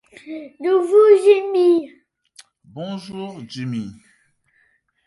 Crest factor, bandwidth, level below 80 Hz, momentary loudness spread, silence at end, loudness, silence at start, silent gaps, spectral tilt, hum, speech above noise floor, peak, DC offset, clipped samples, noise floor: 18 dB; 11.5 kHz; -66 dBFS; 22 LU; 1.15 s; -16 LUFS; 0.25 s; none; -6.5 dB/octave; none; 46 dB; -2 dBFS; under 0.1%; under 0.1%; -63 dBFS